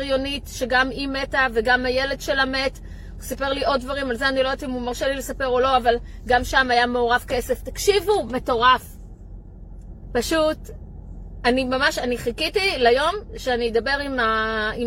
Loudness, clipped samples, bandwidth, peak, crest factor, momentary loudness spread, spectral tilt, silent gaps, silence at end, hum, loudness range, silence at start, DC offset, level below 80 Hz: -21 LUFS; under 0.1%; 16.5 kHz; -4 dBFS; 18 dB; 10 LU; -3.5 dB/octave; none; 0 s; none; 4 LU; 0 s; under 0.1%; -38 dBFS